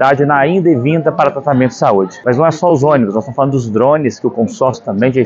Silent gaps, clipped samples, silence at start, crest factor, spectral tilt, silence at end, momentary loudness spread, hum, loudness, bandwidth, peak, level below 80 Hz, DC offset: none; under 0.1%; 0 s; 12 dB; -7.5 dB/octave; 0 s; 5 LU; none; -12 LUFS; 7.8 kHz; 0 dBFS; -54 dBFS; under 0.1%